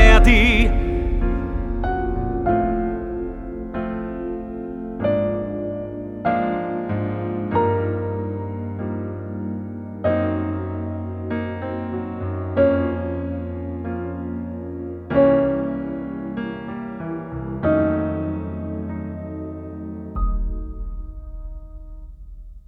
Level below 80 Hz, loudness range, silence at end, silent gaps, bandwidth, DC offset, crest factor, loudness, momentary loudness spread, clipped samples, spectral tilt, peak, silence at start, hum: -26 dBFS; 4 LU; 0.1 s; none; 8.6 kHz; under 0.1%; 22 dB; -23 LUFS; 14 LU; under 0.1%; -7.5 dB/octave; 0 dBFS; 0 s; none